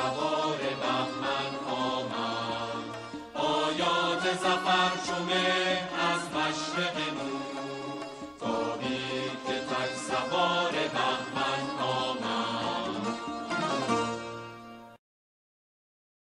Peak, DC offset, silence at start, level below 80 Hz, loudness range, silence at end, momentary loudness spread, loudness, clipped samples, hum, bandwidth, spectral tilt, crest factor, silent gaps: -14 dBFS; under 0.1%; 0 s; -66 dBFS; 6 LU; 1.4 s; 10 LU; -30 LUFS; under 0.1%; none; 12 kHz; -3.5 dB/octave; 16 dB; none